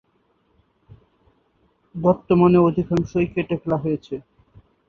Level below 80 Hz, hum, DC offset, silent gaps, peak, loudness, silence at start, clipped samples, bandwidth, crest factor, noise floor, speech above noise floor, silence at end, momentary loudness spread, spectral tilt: -50 dBFS; none; under 0.1%; none; -4 dBFS; -20 LUFS; 1.95 s; under 0.1%; 6.8 kHz; 20 dB; -65 dBFS; 46 dB; 0.7 s; 16 LU; -9 dB/octave